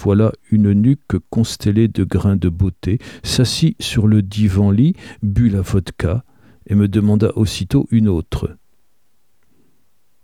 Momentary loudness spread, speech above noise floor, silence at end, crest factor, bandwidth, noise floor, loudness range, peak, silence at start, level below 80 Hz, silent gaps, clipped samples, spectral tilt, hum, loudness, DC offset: 7 LU; 52 dB; 1.7 s; 14 dB; 14 kHz; -67 dBFS; 2 LU; -2 dBFS; 0 s; -34 dBFS; none; under 0.1%; -7 dB/octave; none; -17 LUFS; 0.3%